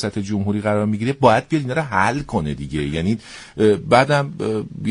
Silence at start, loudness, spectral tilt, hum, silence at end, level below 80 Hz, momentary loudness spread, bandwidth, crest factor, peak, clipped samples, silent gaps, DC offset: 0 s; -19 LUFS; -6.5 dB/octave; none; 0 s; -42 dBFS; 9 LU; 10.5 kHz; 18 dB; 0 dBFS; under 0.1%; none; under 0.1%